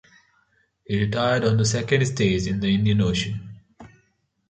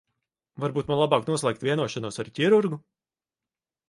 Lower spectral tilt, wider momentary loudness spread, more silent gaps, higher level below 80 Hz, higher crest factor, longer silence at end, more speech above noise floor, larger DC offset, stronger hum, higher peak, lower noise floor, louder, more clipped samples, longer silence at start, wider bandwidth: about the same, -5.5 dB/octave vs -5.5 dB/octave; about the same, 9 LU vs 11 LU; neither; first, -46 dBFS vs -64 dBFS; second, 18 dB vs 24 dB; second, 0.6 s vs 1.1 s; second, 46 dB vs over 65 dB; neither; neither; about the same, -6 dBFS vs -4 dBFS; second, -68 dBFS vs under -90 dBFS; first, -22 LUFS vs -25 LUFS; neither; first, 0.9 s vs 0.6 s; second, 9.2 kHz vs 11.5 kHz